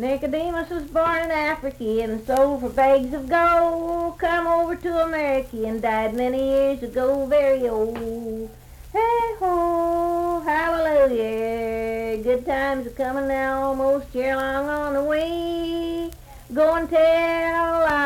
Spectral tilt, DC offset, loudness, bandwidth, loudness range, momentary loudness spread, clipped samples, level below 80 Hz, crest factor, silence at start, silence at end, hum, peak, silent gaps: -5.5 dB/octave; under 0.1%; -22 LUFS; 16.5 kHz; 3 LU; 8 LU; under 0.1%; -44 dBFS; 14 dB; 0 s; 0 s; none; -6 dBFS; none